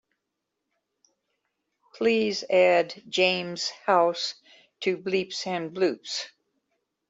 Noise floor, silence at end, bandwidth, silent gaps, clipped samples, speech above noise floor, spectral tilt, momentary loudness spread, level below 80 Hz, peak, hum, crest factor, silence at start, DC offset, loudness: -83 dBFS; 0.8 s; 8 kHz; none; under 0.1%; 58 dB; -3.5 dB/octave; 10 LU; -74 dBFS; -8 dBFS; none; 20 dB; 1.95 s; under 0.1%; -25 LUFS